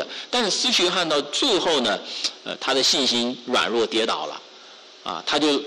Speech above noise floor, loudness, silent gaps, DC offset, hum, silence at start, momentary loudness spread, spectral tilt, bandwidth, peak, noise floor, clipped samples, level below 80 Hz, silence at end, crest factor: 23 dB; -21 LUFS; none; under 0.1%; none; 0 s; 10 LU; -1.5 dB/octave; 13.5 kHz; -12 dBFS; -45 dBFS; under 0.1%; -62 dBFS; 0 s; 12 dB